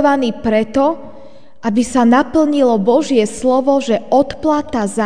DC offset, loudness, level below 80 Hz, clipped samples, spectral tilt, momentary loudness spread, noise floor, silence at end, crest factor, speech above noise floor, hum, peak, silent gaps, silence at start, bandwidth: 2%; -14 LUFS; -44 dBFS; under 0.1%; -5.5 dB/octave; 6 LU; -41 dBFS; 0 s; 14 dB; 27 dB; none; 0 dBFS; none; 0 s; 10 kHz